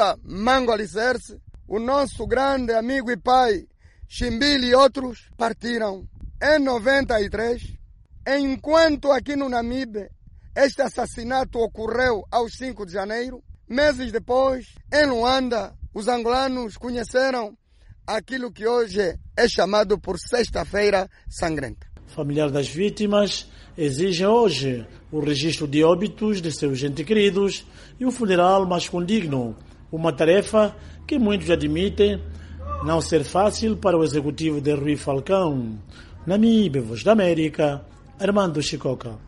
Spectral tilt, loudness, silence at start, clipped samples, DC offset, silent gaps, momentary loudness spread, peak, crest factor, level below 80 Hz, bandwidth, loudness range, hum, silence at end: -5 dB/octave; -22 LUFS; 0 s; under 0.1%; under 0.1%; none; 12 LU; -4 dBFS; 18 dB; -42 dBFS; 11.5 kHz; 3 LU; none; 0 s